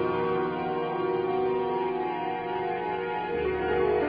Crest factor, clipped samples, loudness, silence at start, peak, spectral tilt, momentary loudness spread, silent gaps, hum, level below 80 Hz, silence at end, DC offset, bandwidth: 12 dB; under 0.1%; -29 LUFS; 0 s; -16 dBFS; -9 dB/octave; 3 LU; none; none; -52 dBFS; 0 s; under 0.1%; 5.2 kHz